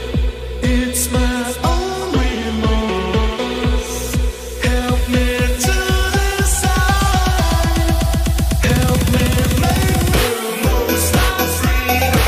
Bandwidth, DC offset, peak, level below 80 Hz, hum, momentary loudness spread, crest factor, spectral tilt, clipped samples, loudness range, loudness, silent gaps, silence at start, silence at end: 15.5 kHz; under 0.1%; -2 dBFS; -20 dBFS; none; 5 LU; 12 dB; -4.5 dB/octave; under 0.1%; 3 LU; -17 LUFS; none; 0 s; 0 s